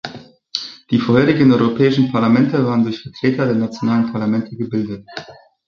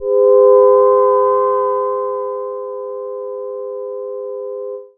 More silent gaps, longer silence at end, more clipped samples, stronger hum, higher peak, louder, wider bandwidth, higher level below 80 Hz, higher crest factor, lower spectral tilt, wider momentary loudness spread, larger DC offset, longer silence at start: neither; first, 0.35 s vs 0.1 s; neither; neither; about the same, -2 dBFS vs 0 dBFS; second, -17 LUFS vs -13 LUFS; first, 7 kHz vs 2.2 kHz; first, -54 dBFS vs -68 dBFS; about the same, 14 dB vs 14 dB; second, -7.5 dB/octave vs -11 dB/octave; second, 13 LU vs 16 LU; neither; about the same, 0.05 s vs 0 s